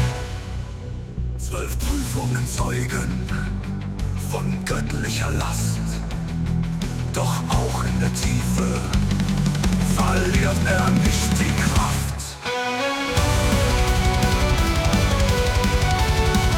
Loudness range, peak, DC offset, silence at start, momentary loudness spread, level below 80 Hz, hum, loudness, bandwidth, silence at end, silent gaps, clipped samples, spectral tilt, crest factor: 6 LU; -6 dBFS; under 0.1%; 0 s; 8 LU; -26 dBFS; none; -22 LUFS; 18 kHz; 0 s; none; under 0.1%; -5 dB/octave; 14 dB